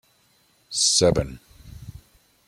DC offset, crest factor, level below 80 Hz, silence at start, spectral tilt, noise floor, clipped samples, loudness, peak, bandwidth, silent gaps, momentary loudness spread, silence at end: under 0.1%; 20 dB; -44 dBFS; 0.7 s; -3 dB/octave; -62 dBFS; under 0.1%; -20 LUFS; -6 dBFS; 16 kHz; none; 26 LU; 0.55 s